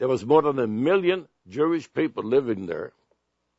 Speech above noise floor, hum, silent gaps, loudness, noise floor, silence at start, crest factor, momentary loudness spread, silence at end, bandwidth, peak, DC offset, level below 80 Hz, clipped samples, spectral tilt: 49 dB; none; none; -24 LUFS; -72 dBFS; 0 s; 20 dB; 13 LU; 0.7 s; 8 kHz; -4 dBFS; under 0.1%; -66 dBFS; under 0.1%; -7 dB/octave